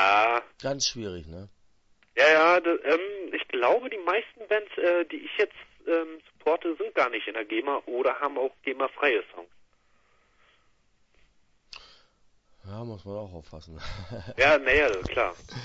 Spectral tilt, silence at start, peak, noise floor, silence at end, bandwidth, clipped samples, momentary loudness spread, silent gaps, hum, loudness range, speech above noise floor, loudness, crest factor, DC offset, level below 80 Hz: -3.5 dB/octave; 0 s; -8 dBFS; -66 dBFS; 0 s; 7.8 kHz; under 0.1%; 20 LU; none; none; 18 LU; 40 dB; -25 LUFS; 20 dB; under 0.1%; -52 dBFS